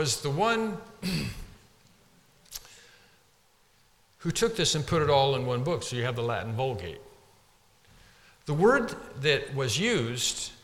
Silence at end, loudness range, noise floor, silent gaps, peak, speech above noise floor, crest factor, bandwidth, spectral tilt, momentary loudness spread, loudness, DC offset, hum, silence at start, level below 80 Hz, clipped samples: 0.1 s; 11 LU; -64 dBFS; none; -10 dBFS; 37 dB; 20 dB; 17 kHz; -4 dB/octave; 18 LU; -28 LUFS; under 0.1%; none; 0 s; -54 dBFS; under 0.1%